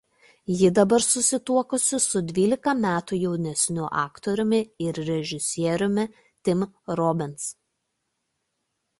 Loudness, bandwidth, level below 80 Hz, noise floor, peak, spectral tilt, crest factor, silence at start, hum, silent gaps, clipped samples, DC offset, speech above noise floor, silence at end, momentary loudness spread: -24 LUFS; 12 kHz; -62 dBFS; -78 dBFS; -6 dBFS; -4.5 dB/octave; 20 dB; 0.5 s; none; none; under 0.1%; under 0.1%; 54 dB; 1.45 s; 10 LU